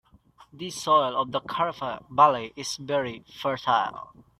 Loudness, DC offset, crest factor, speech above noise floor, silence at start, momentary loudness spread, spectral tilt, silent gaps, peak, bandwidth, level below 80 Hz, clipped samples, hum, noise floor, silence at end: -25 LUFS; under 0.1%; 22 dB; 31 dB; 0.4 s; 14 LU; -3.5 dB/octave; none; -4 dBFS; 15 kHz; -64 dBFS; under 0.1%; none; -56 dBFS; 0.35 s